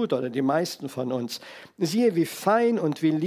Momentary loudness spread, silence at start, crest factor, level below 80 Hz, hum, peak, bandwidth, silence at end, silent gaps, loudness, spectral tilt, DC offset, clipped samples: 10 LU; 0 s; 16 dB; -78 dBFS; none; -8 dBFS; 16 kHz; 0 s; none; -25 LUFS; -5.5 dB/octave; under 0.1%; under 0.1%